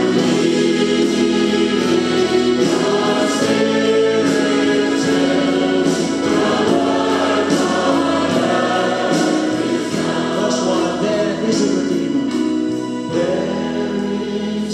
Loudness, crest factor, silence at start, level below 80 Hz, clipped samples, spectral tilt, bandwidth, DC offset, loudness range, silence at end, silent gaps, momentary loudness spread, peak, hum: -17 LUFS; 14 dB; 0 s; -52 dBFS; under 0.1%; -4.5 dB/octave; 13 kHz; under 0.1%; 3 LU; 0 s; none; 4 LU; -2 dBFS; none